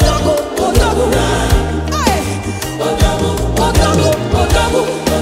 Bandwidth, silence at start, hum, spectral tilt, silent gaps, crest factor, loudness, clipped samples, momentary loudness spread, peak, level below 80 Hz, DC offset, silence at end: 16.5 kHz; 0 s; none; -5 dB/octave; none; 12 dB; -14 LUFS; under 0.1%; 5 LU; 0 dBFS; -20 dBFS; under 0.1%; 0 s